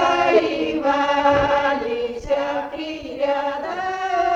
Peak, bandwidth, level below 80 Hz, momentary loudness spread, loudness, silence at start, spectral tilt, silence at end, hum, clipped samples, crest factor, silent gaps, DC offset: -4 dBFS; 7.8 kHz; -46 dBFS; 9 LU; -21 LUFS; 0 s; -5 dB/octave; 0 s; none; under 0.1%; 16 dB; none; under 0.1%